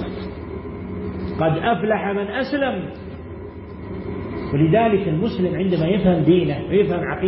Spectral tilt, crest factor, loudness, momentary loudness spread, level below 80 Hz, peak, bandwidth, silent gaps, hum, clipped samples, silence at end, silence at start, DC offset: -12 dB/octave; 16 dB; -20 LUFS; 16 LU; -42 dBFS; -4 dBFS; 5.8 kHz; none; none; under 0.1%; 0 s; 0 s; under 0.1%